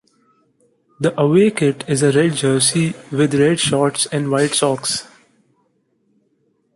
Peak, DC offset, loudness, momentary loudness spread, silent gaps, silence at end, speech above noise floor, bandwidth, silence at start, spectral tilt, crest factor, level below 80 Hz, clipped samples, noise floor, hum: -2 dBFS; under 0.1%; -16 LUFS; 7 LU; none; 1.7 s; 47 dB; 11.5 kHz; 1 s; -4.5 dB/octave; 16 dB; -58 dBFS; under 0.1%; -64 dBFS; none